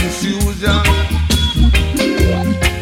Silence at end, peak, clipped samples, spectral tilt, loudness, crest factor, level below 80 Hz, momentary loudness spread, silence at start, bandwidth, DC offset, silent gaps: 0 s; 0 dBFS; under 0.1%; -5 dB/octave; -15 LUFS; 12 dB; -18 dBFS; 4 LU; 0 s; 16.5 kHz; under 0.1%; none